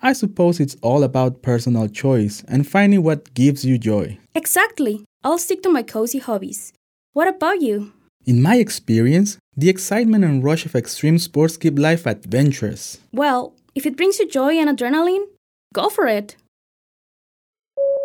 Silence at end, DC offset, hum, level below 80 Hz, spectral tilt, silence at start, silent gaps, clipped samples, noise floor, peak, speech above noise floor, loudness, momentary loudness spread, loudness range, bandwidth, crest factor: 0 s; under 0.1%; none; -62 dBFS; -6 dB/octave; 0.05 s; 5.06-5.20 s, 6.77-7.13 s, 8.09-8.20 s, 9.40-9.52 s, 15.37-15.70 s, 16.48-17.53 s; under 0.1%; under -90 dBFS; -2 dBFS; over 73 dB; -18 LUFS; 10 LU; 4 LU; 18.5 kHz; 16 dB